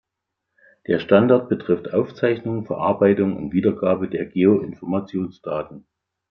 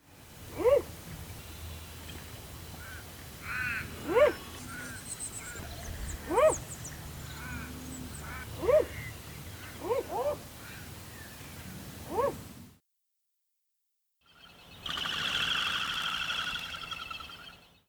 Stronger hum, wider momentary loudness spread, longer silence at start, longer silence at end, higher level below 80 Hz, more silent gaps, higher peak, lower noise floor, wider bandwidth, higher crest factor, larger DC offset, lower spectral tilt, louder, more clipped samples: neither; second, 11 LU vs 18 LU; first, 0.9 s vs 0.05 s; first, 0.5 s vs 0.2 s; second, -60 dBFS vs -52 dBFS; neither; first, -2 dBFS vs -12 dBFS; about the same, -81 dBFS vs -80 dBFS; second, 5.8 kHz vs over 20 kHz; about the same, 18 dB vs 22 dB; neither; first, -10 dB/octave vs -3 dB/octave; first, -21 LUFS vs -33 LUFS; neither